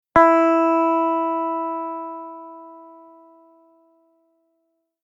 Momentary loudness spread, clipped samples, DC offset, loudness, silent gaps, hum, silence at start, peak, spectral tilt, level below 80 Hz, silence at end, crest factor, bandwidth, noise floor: 23 LU; under 0.1%; under 0.1%; -19 LUFS; none; none; 0.15 s; -2 dBFS; -7 dB/octave; -56 dBFS; 2.2 s; 20 dB; 7.6 kHz; -72 dBFS